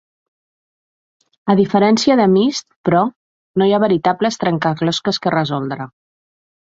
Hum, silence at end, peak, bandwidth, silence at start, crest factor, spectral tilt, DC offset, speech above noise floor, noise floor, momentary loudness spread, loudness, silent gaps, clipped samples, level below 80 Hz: none; 0.8 s; -2 dBFS; 7.8 kHz; 1.45 s; 16 dB; -6 dB/octave; under 0.1%; over 75 dB; under -90 dBFS; 11 LU; -16 LUFS; 2.76-2.84 s, 3.16-3.54 s; under 0.1%; -58 dBFS